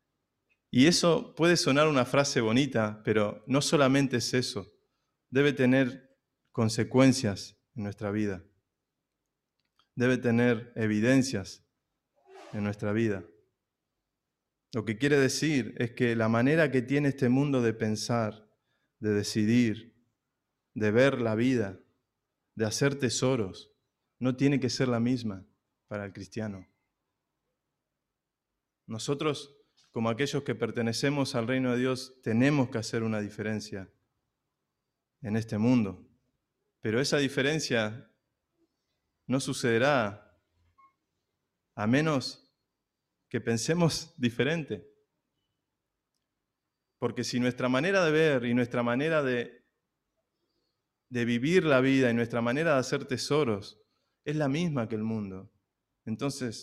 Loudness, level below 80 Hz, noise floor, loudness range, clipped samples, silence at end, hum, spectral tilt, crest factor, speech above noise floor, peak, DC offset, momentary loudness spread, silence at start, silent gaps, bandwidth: -28 LUFS; -66 dBFS; -87 dBFS; 7 LU; under 0.1%; 0 s; none; -5.5 dB/octave; 20 dB; 59 dB; -10 dBFS; under 0.1%; 14 LU; 0.75 s; none; 13.5 kHz